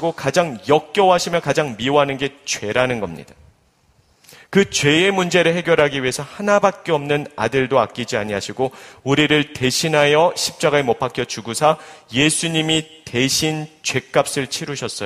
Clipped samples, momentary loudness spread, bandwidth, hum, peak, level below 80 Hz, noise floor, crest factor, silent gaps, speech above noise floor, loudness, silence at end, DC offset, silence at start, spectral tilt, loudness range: under 0.1%; 9 LU; 15.5 kHz; none; 0 dBFS; -52 dBFS; -58 dBFS; 18 dB; none; 39 dB; -18 LUFS; 0 s; under 0.1%; 0 s; -4 dB/octave; 3 LU